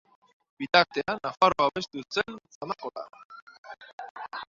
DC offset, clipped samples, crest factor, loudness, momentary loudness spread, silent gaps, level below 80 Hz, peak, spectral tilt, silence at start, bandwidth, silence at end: under 0.1%; under 0.1%; 26 dB; -27 LUFS; 24 LU; 2.55-2.61 s, 3.25-3.30 s, 3.42-3.47 s, 3.58-3.63 s, 3.93-3.98 s, 4.11-4.15 s; -66 dBFS; -4 dBFS; -4 dB/octave; 0.6 s; 7.6 kHz; 0.05 s